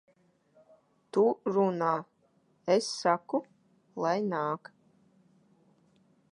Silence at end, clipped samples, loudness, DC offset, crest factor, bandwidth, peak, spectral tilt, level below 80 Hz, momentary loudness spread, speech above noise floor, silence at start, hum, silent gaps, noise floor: 1.75 s; under 0.1%; -30 LUFS; under 0.1%; 22 dB; 11 kHz; -12 dBFS; -5.5 dB/octave; -84 dBFS; 8 LU; 40 dB; 1.15 s; none; none; -69 dBFS